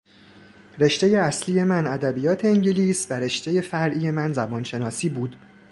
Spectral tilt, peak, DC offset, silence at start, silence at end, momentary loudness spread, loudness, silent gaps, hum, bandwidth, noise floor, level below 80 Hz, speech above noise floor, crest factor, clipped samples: -5.5 dB/octave; -6 dBFS; under 0.1%; 0.75 s; 0.35 s; 8 LU; -22 LUFS; none; none; 11.5 kHz; -50 dBFS; -62 dBFS; 28 dB; 18 dB; under 0.1%